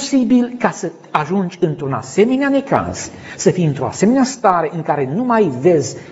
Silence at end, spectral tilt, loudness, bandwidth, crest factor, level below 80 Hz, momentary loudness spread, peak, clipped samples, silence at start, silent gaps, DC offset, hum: 0 s; -6 dB/octave; -16 LUFS; 8 kHz; 16 dB; -54 dBFS; 7 LU; 0 dBFS; under 0.1%; 0 s; none; under 0.1%; none